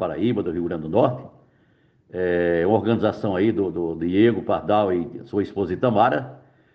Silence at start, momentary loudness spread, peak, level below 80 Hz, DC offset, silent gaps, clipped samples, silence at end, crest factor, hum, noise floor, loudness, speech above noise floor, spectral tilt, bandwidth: 0 s; 8 LU; -4 dBFS; -54 dBFS; under 0.1%; none; under 0.1%; 0.35 s; 18 dB; none; -60 dBFS; -22 LUFS; 39 dB; -9.5 dB/octave; 5.8 kHz